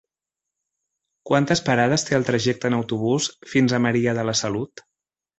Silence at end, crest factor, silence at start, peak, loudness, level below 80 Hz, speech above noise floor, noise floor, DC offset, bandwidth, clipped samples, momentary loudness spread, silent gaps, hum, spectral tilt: 0.75 s; 18 dB; 1.25 s; -4 dBFS; -21 LUFS; -56 dBFS; 66 dB; -87 dBFS; under 0.1%; 8.2 kHz; under 0.1%; 5 LU; none; none; -4.5 dB/octave